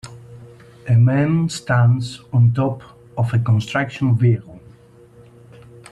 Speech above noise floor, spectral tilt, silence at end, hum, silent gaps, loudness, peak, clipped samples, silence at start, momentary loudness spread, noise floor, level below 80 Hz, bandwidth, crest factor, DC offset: 30 dB; -7.5 dB/octave; 1.35 s; none; none; -18 LUFS; -4 dBFS; under 0.1%; 0.05 s; 9 LU; -46 dBFS; -52 dBFS; 10 kHz; 14 dB; under 0.1%